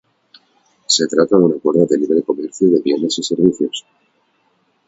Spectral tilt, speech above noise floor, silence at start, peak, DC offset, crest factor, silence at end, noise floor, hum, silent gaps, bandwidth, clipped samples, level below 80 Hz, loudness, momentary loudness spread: -4.5 dB/octave; 47 dB; 0.9 s; 0 dBFS; under 0.1%; 16 dB; 1.1 s; -62 dBFS; none; none; 8 kHz; under 0.1%; -58 dBFS; -15 LUFS; 8 LU